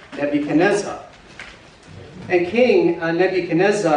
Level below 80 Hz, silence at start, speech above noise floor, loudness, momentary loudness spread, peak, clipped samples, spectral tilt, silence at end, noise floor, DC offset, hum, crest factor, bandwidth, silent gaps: -56 dBFS; 0 s; 25 dB; -18 LUFS; 22 LU; -4 dBFS; under 0.1%; -5.5 dB/octave; 0 s; -42 dBFS; under 0.1%; none; 16 dB; 10.5 kHz; none